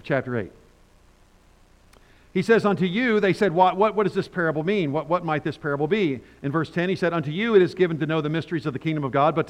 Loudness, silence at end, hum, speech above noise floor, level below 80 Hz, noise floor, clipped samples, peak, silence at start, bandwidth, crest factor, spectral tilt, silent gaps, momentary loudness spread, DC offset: -23 LUFS; 0 s; none; 33 dB; -58 dBFS; -55 dBFS; under 0.1%; -6 dBFS; 0.05 s; 10.5 kHz; 18 dB; -7.5 dB/octave; none; 8 LU; under 0.1%